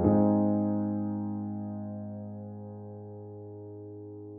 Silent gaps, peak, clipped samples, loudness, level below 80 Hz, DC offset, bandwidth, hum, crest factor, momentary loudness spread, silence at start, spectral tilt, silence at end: none; -10 dBFS; under 0.1%; -31 LUFS; -58 dBFS; under 0.1%; 2.2 kHz; none; 20 dB; 19 LU; 0 s; -10 dB/octave; 0 s